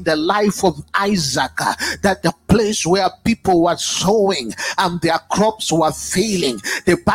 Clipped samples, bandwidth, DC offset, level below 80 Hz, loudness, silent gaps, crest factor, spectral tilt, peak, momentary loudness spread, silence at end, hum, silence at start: under 0.1%; 16.5 kHz; under 0.1%; -42 dBFS; -17 LUFS; none; 18 dB; -4 dB/octave; 0 dBFS; 4 LU; 0 s; none; 0 s